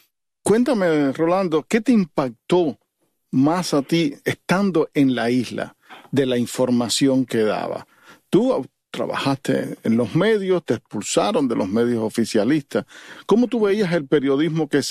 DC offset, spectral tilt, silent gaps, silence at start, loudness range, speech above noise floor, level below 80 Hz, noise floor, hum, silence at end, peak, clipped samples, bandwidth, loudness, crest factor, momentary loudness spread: under 0.1%; -5.5 dB/octave; none; 0.45 s; 1 LU; 51 dB; -60 dBFS; -70 dBFS; none; 0 s; -4 dBFS; under 0.1%; 14 kHz; -20 LUFS; 16 dB; 8 LU